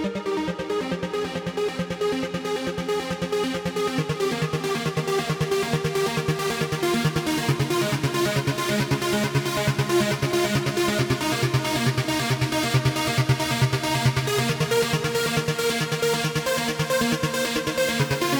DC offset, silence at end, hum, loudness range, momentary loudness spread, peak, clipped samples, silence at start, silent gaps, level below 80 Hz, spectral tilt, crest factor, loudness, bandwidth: under 0.1%; 0 s; none; 4 LU; 5 LU; -8 dBFS; under 0.1%; 0 s; none; -48 dBFS; -4.5 dB/octave; 16 dB; -24 LUFS; over 20 kHz